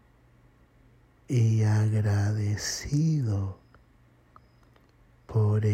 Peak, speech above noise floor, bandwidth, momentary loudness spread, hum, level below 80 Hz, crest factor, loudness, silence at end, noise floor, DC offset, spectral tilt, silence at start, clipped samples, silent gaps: -14 dBFS; 35 dB; 12 kHz; 8 LU; none; -56 dBFS; 12 dB; -27 LUFS; 0 s; -60 dBFS; under 0.1%; -6.5 dB/octave; 1.3 s; under 0.1%; none